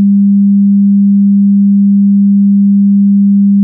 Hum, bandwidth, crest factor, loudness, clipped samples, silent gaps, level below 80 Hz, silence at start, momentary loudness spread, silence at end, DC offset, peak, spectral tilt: none; 0.3 kHz; 4 dB; -7 LUFS; under 0.1%; none; -66 dBFS; 0 s; 0 LU; 0 s; under 0.1%; -4 dBFS; -23 dB/octave